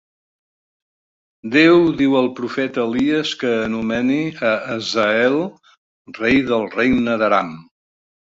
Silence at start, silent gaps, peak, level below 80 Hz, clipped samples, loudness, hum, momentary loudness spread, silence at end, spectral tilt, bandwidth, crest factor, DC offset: 1.45 s; 5.77-6.05 s; -2 dBFS; -52 dBFS; under 0.1%; -17 LUFS; none; 8 LU; 0.65 s; -5.5 dB/octave; 7.8 kHz; 18 dB; under 0.1%